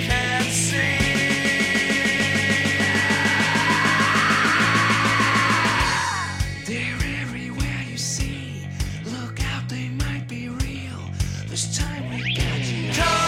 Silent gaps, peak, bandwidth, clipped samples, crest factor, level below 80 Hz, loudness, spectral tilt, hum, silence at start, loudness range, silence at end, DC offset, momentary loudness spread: none; -6 dBFS; 16.5 kHz; under 0.1%; 16 dB; -36 dBFS; -21 LUFS; -3.5 dB/octave; none; 0 s; 10 LU; 0 s; under 0.1%; 11 LU